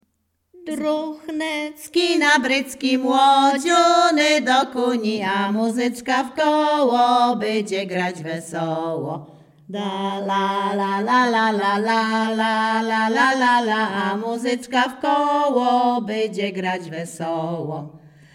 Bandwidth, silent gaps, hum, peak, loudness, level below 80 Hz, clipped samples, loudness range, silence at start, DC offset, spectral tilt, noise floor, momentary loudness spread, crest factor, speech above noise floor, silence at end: 16.5 kHz; none; none; -4 dBFS; -20 LUFS; -68 dBFS; under 0.1%; 5 LU; 0.55 s; under 0.1%; -4 dB/octave; -70 dBFS; 11 LU; 16 dB; 50 dB; 0.35 s